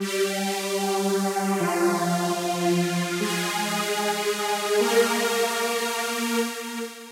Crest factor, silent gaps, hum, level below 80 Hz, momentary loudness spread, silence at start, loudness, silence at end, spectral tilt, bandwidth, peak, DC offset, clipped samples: 16 dB; none; none; -82 dBFS; 4 LU; 0 s; -24 LUFS; 0 s; -3.5 dB/octave; 16 kHz; -8 dBFS; under 0.1%; under 0.1%